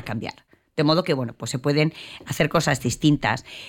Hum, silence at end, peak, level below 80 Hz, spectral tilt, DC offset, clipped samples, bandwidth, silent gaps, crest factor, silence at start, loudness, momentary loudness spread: none; 0 s; -6 dBFS; -50 dBFS; -5 dB/octave; under 0.1%; under 0.1%; 17.5 kHz; none; 18 dB; 0 s; -23 LUFS; 12 LU